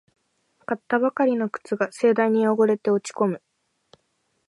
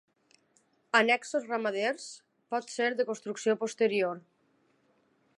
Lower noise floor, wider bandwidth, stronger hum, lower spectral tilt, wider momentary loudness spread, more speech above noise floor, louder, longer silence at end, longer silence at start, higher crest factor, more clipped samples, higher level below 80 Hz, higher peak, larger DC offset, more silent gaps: about the same, -71 dBFS vs -70 dBFS; about the same, 11.5 kHz vs 11.5 kHz; neither; first, -6.5 dB/octave vs -3 dB/octave; about the same, 11 LU vs 12 LU; first, 50 dB vs 40 dB; first, -23 LUFS vs -30 LUFS; about the same, 1.1 s vs 1.2 s; second, 0.7 s vs 0.95 s; second, 16 dB vs 24 dB; neither; first, -78 dBFS vs -88 dBFS; about the same, -6 dBFS vs -8 dBFS; neither; neither